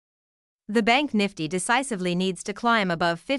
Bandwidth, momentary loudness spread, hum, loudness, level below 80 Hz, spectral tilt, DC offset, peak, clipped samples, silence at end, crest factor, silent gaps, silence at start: 12 kHz; 6 LU; none; -24 LUFS; -60 dBFS; -4 dB/octave; under 0.1%; -6 dBFS; under 0.1%; 0 s; 18 dB; none; 0.7 s